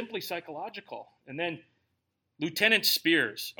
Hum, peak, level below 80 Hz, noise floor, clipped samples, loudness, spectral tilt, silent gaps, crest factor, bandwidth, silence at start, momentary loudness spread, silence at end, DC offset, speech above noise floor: none; -8 dBFS; -82 dBFS; -80 dBFS; under 0.1%; -27 LUFS; -2.5 dB/octave; none; 24 dB; 17.5 kHz; 0 s; 21 LU; 0.1 s; under 0.1%; 50 dB